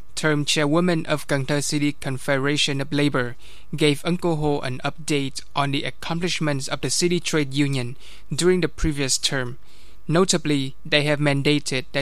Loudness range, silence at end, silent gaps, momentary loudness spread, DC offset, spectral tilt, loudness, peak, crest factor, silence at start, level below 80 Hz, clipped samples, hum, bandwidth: 2 LU; 0 s; none; 8 LU; 3%; -4.5 dB/octave; -22 LUFS; -4 dBFS; 20 dB; 0.15 s; -42 dBFS; under 0.1%; none; 15 kHz